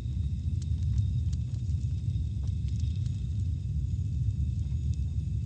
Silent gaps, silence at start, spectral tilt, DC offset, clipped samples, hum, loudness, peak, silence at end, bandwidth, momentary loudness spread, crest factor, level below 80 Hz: none; 0 s; -8 dB/octave; under 0.1%; under 0.1%; none; -32 LUFS; -16 dBFS; 0 s; 8.6 kHz; 3 LU; 14 dB; -34 dBFS